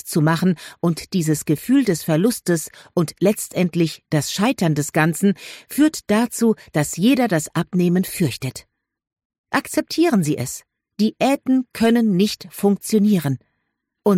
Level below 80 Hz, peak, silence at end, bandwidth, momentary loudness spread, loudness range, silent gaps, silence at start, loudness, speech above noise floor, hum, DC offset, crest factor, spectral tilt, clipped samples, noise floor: -56 dBFS; -4 dBFS; 0 s; 16.5 kHz; 6 LU; 3 LU; 9.25-9.30 s, 9.38-9.44 s; 0.05 s; -20 LUFS; 56 dB; none; under 0.1%; 14 dB; -5.5 dB/octave; under 0.1%; -75 dBFS